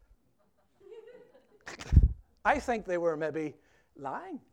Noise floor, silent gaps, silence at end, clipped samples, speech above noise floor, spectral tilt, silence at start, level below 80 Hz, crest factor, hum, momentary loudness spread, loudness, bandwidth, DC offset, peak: -72 dBFS; none; 0.15 s; under 0.1%; 39 dB; -7 dB/octave; 0.9 s; -36 dBFS; 24 dB; none; 24 LU; -31 LUFS; 9.4 kHz; under 0.1%; -8 dBFS